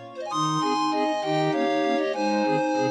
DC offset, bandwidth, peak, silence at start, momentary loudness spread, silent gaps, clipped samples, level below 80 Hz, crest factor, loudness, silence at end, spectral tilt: under 0.1%; 10 kHz; -12 dBFS; 0 s; 2 LU; none; under 0.1%; -78 dBFS; 12 dB; -24 LUFS; 0 s; -5 dB/octave